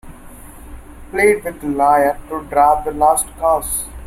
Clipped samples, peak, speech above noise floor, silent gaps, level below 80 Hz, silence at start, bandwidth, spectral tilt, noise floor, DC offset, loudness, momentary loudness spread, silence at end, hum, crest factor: under 0.1%; -2 dBFS; 21 dB; none; -38 dBFS; 0.05 s; 16.5 kHz; -4 dB/octave; -37 dBFS; under 0.1%; -16 LUFS; 9 LU; 0 s; none; 16 dB